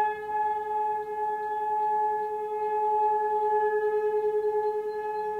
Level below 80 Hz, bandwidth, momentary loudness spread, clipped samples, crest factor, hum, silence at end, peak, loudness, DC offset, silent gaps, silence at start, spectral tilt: -70 dBFS; 4.5 kHz; 5 LU; under 0.1%; 10 dB; none; 0 s; -18 dBFS; -28 LUFS; under 0.1%; none; 0 s; -5 dB/octave